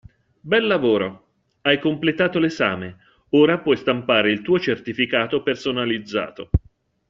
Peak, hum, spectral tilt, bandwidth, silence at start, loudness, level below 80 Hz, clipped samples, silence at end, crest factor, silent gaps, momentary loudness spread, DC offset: -2 dBFS; none; -3.5 dB/octave; 7.6 kHz; 0.45 s; -20 LUFS; -42 dBFS; under 0.1%; 0.5 s; 18 dB; none; 8 LU; under 0.1%